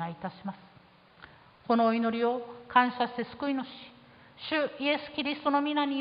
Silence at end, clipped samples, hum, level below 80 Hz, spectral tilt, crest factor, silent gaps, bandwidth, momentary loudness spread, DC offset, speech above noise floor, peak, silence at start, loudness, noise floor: 0 s; under 0.1%; none; -70 dBFS; -8.5 dB/octave; 24 dB; none; 5.2 kHz; 17 LU; under 0.1%; 28 dB; -8 dBFS; 0 s; -29 LUFS; -57 dBFS